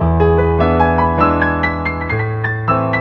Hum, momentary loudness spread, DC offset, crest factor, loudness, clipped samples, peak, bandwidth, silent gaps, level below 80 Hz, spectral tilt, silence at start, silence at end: none; 6 LU; under 0.1%; 14 dB; -15 LUFS; under 0.1%; 0 dBFS; 5.6 kHz; none; -26 dBFS; -9.5 dB/octave; 0 s; 0 s